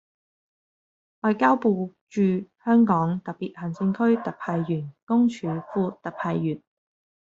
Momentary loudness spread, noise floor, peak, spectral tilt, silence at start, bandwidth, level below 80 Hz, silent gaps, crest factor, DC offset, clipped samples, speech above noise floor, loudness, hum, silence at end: 11 LU; under -90 dBFS; -6 dBFS; -7.5 dB/octave; 1.25 s; 7.6 kHz; -68 dBFS; 2.01-2.07 s, 5.03-5.07 s; 20 dB; under 0.1%; under 0.1%; over 66 dB; -25 LUFS; none; 0.65 s